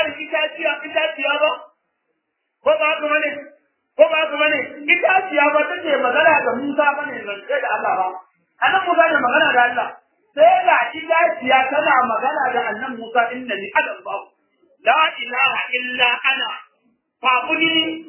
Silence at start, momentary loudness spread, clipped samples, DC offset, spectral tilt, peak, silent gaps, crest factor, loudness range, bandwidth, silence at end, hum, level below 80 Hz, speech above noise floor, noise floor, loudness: 0 s; 11 LU; under 0.1%; under 0.1%; -6 dB/octave; 0 dBFS; none; 18 dB; 4 LU; 3.2 kHz; 0 s; none; -70 dBFS; 56 dB; -74 dBFS; -17 LUFS